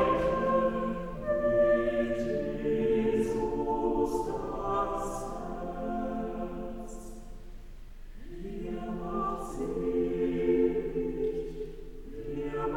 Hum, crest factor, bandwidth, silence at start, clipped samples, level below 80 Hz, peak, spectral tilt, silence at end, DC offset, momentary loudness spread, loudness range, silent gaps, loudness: none; 16 dB; 17 kHz; 0 s; under 0.1%; -44 dBFS; -14 dBFS; -7 dB/octave; 0 s; under 0.1%; 16 LU; 10 LU; none; -31 LUFS